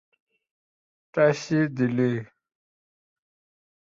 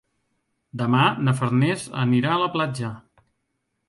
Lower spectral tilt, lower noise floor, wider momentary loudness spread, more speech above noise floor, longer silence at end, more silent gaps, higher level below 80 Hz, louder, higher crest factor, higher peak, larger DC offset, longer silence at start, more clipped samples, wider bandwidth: about the same, -7 dB/octave vs -6.5 dB/octave; first, under -90 dBFS vs -76 dBFS; about the same, 9 LU vs 11 LU; first, over 67 dB vs 54 dB; first, 1.6 s vs 0.9 s; neither; second, -68 dBFS vs -62 dBFS; about the same, -24 LUFS vs -22 LUFS; about the same, 20 dB vs 18 dB; about the same, -8 dBFS vs -6 dBFS; neither; first, 1.15 s vs 0.75 s; neither; second, 7.6 kHz vs 11.5 kHz